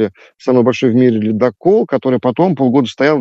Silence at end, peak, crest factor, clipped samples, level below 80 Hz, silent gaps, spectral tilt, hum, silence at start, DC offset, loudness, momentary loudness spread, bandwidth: 0 s; 0 dBFS; 12 dB; under 0.1%; -62 dBFS; none; -7.5 dB/octave; none; 0 s; under 0.1%; -13 LUFS; 4 LU; 7.8 kHz